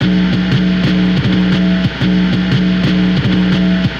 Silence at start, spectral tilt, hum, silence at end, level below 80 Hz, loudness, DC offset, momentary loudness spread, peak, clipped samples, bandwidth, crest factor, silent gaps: 0 s; -7.5 dB/octave; none; 0 s; -30 dBFS; -13 LUFS; 0.3%; 1 LU; -2 dBFS; under 0.1%; 7 kHz; 10 dB; none